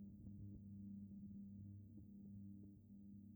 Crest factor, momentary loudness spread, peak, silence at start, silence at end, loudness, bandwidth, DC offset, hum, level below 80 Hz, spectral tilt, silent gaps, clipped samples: 10 dB; 5 LU; -46 dBFS; 0 s; 0 s; -58 LUFS; over 20 kHz; under 0.1%; none; -72 dBFS; -10.5 dB/octave; none; under 0.1%